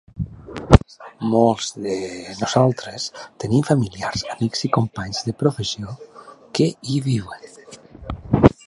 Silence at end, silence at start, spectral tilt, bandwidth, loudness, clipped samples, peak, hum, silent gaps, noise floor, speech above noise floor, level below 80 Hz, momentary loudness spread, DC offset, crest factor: 0.15 s; 0.15 s; -6 dB/octave; 11.5 kHz; -21 LUFS; under 0.1%; 0 dBFS; none; none; -41 dBFS; 20 dB; -34 dBFS; 18 LU; under 0.1%; 20 dB